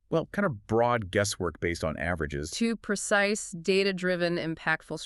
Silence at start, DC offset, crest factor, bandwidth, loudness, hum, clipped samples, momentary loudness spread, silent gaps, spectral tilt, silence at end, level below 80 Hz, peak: 0.1 s; under 0.1%; 18 dB; 12 kHz; -28 LUFS; none; under 0.1%; 6 LU; none; -4.5 dB/octave; 0 s; -52 dBFS; -10 dBFS